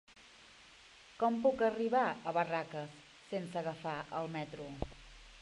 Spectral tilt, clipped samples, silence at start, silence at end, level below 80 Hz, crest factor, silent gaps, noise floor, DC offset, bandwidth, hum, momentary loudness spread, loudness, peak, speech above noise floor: -6 dB/octave; under 0.1%; 0.1 s; 0 s; -60 dBFS; 20 dB; none; -59 dBFS; under 0.1%; 11.5 kHz; none; 25 LU; -37 LUFS; -18 dBFS; 24 dB